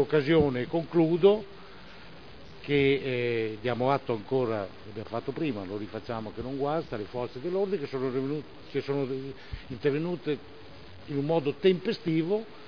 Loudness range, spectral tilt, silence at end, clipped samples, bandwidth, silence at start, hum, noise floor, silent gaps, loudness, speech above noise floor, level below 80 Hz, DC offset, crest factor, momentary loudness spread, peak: 5 LU; -8.5 dB/octave; 0 s; under 0.1%; 5.4 kHz; 0 s; none; -48 dBFS; none; -29 LUFS; 20 dB; -56 dBFS; 0.4%; 22 dB; 21 LU; -8 dBFS